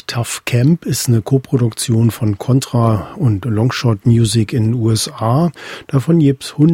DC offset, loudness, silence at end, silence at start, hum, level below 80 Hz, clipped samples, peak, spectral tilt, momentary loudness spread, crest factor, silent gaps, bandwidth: under 0.1%; -15 LUFS; 0 s; 0.1 s; none; -44 dBFS; under 0.1%; 0 dBFS; -6 dB/octave; 5 LU; 14 dB; none; 16.5 kHz